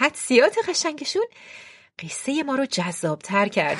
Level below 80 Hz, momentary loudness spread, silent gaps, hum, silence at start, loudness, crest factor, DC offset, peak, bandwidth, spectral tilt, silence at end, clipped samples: -72 dBFS; 23 LU; none; none; 0 s; -23 LUFS; 20 dB; under 0.1%; -2 dBFS; 11.5 kHz; -3.5 dB/octave; 0 s; under 0.1%